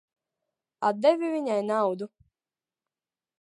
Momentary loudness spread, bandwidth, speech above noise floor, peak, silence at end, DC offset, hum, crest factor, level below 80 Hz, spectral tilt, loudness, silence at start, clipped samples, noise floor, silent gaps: 10 LU; 11 kHz; over 64 dB; -8 dBFS; 1.35 s; under 0.1%; none; 20 dB; -78 dBFS; -6 dB/octave; -26 LUFS; 0.8 s; under 0.1%; under -90 dBFS; none